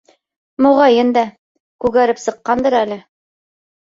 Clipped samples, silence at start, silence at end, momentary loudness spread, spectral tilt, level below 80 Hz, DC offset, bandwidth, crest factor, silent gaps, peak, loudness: under 0.1%; 0.6 s; 0.85 s; 13 LU; -4.5 dB/octave; -52 dBFS; under 0.1%; 7.8 kHz; 14 dB; 1.38-1.79 s; -2 dBFS; -15 LUFS